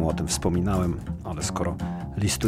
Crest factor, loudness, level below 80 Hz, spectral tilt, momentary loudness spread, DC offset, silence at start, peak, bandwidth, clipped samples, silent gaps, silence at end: 16 dB; -27 LUFS; -38 dBFS; -5 dB/octave; 7 LU; under 0.1%; 0 s; -10 dBFS; 16 kHz; under 0.1%; none; 0 s